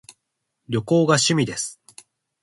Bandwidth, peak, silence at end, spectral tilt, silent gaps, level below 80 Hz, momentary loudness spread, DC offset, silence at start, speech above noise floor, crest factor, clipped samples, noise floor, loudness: 11.5 kHz; -4 dBFS; 0.7 s; -4 dB/octave; none; -60 dBFS; 12 LU; under 0.1%; 0.7 s; 58 dB; 20 dB; under 0.1%; -78 dBFS; -20 LUFS